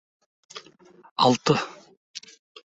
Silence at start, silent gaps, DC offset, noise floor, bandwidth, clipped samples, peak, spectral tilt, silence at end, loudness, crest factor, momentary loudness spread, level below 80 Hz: 0.55 s; 1.11-1.16 s, 1.97-2.14 s; under 0.1%; -53 dBFS; 8.2 kHz; under 0.1%; -6 dBFS; -4.5 dB/octave; 0.5 s; -22 LUFS; 22 dB; 23 LU; -64 dBFS